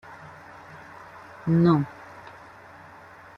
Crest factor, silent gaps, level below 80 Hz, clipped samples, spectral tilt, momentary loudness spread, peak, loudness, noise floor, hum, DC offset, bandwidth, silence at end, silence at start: 20 dB; none; -60 dBFS; under 0.1%; -9.5 dB/octave; 26 LU; -8 dBFS; -23 LUFS; -47 dBFS; none; under 0.1%; 6.2 kHz; 1.15 s; 0.1 s